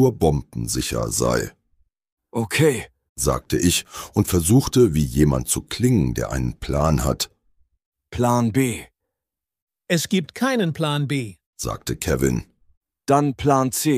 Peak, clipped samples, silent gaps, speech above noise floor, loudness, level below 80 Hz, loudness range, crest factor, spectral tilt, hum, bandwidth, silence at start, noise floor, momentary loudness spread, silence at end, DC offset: -4 dBFS; under 0.1%; 2.12-2.17 s, 3.09-3.16 s, 7.86-7.92 s, 9.62-9.67 s, 11.46-11.53 s, 12.77-12.81 s; 66 dB; -21 LUFS; -36 dBFS; 5 LU; 18 dB; -5 dB/octave; none; 15.5 kHz; 0 s; -87 dBFS; 10 LU; 0 s; under 0.1%